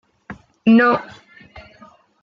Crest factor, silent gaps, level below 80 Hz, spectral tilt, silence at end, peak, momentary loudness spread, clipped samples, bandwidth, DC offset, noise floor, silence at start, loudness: 16 dB; none; -56 dBFS; -7.5 dB/octave; 0.65 s; -4 dBFS; 26 LU; under 0.1%; 5.6 kHz; under 0.1%; -49 dBFS; 0.3 s; -16 LUFS